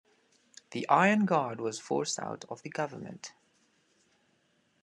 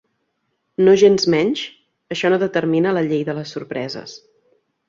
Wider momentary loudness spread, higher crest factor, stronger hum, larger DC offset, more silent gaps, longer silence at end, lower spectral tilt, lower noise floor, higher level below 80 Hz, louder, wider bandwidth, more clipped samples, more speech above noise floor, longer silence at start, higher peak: about the same, 19 LU vs 18 LU; first, 24 dB vs 16 dB; neither; neither; neither; first, 1.5 s vs 0.7 s; about the same, -4.5 dB/octave vs -5.5 dB/octave; about the same, -72 dBFS vs -71 dBFS; second, -82 dBFS vs -62 dBFS; second, -30 LUFS vs -18 LUFS; first, 11 kHz vs 7.6 kHz; neither; second, 41 dB vs 54 dB; about the same, 0.7 s vs 0.8 s; second, -8 dBFS vs -2 dBFS